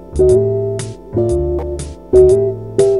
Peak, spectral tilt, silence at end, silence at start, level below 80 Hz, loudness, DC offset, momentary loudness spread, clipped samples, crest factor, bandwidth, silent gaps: 0 dBFS; -8 dB/octave; 0 s; 0 s; -28 dBFS; -14 LUFS; 0.4%; 13 LU; under 0.1%; 14 dB; 11.5 kHz; none